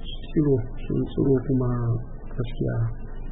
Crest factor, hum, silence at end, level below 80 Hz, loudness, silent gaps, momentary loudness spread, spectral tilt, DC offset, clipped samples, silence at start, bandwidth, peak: 14 dB; none; 0 s; -32 dBFS; -26 LUFS; none; 10 LU; -13 dB/octave; under 0.1%; under 0.1%; 0 s; 4 kHz; -10 dBFS